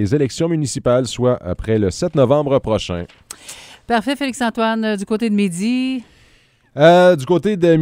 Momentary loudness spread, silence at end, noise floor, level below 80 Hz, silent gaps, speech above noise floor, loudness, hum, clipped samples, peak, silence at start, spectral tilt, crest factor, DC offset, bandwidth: 16 LU; 0 s; -54 dBFS; -44 dBFS; none; 37 dB; -17 LUFS; none; under 0.1%; 0 dBFS; 0 s; -6 dB/octave; 16 dB; under 0.1%; 16 kHz